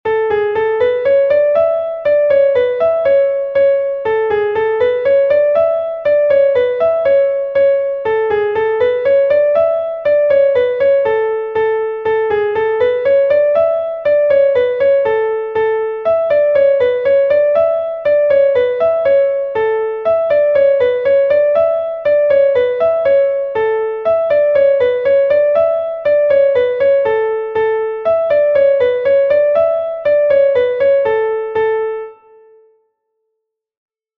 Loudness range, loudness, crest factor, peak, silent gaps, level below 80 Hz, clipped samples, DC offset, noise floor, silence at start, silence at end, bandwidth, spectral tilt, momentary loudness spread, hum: 1 LU; -13 LUFS; 10 dB; -2 dBFS; none; -52 dBFS; under 0.1%; under 0.1%; -74 dBFS; 0.05 s; 2.05 s; 4.5 kHz; -6.5 dB/octave; 5 LU; none